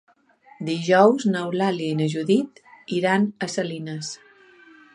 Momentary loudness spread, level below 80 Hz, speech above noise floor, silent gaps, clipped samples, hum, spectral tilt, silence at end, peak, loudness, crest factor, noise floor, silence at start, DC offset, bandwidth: 16 LU; -72 dBFS; 33 dB; none; under 0.1%; none; -5.5 dB/octave; 0.8 s; -2 dBFS; -22 LUFS; 20 dB; -54 dBFS; 0.6 s; under 0.1%; 11 kHz